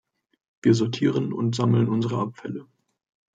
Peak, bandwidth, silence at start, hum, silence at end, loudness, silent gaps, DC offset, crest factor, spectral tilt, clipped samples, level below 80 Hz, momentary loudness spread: -6 dBFS; 7.8 kHz; 0.65 s; none; 0.75 s; -23 LUFS; none; under 0.1%; 18 dB; -7 dB/octave; under 0.1%; -64 dBFS; 13 LU